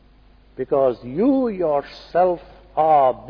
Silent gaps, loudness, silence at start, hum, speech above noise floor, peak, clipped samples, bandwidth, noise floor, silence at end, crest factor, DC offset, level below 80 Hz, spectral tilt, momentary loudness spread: none; -20 LUFS; 0.6 s; none; 32 dB; -6 dBFS; under 0.1%; 5.4 kHz; -51 dBFS; 0 s; 14 dB; under 0.1%; -50 dBFS; -9 dB/octave; 11 LU